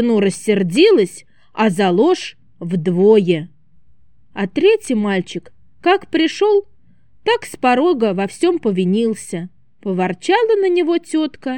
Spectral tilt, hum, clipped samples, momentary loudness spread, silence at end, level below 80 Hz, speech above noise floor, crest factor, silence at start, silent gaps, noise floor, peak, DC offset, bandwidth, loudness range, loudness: -5.5 dB/octave; none; under 0.1%; 15 LU; 0 s; -62 dBFS; 41 dB; 14 dB; 0 s; none; -57 dBFS; -2 dBFS; 0.5%; 12.5 kHz; 3 LU; -16 LUFS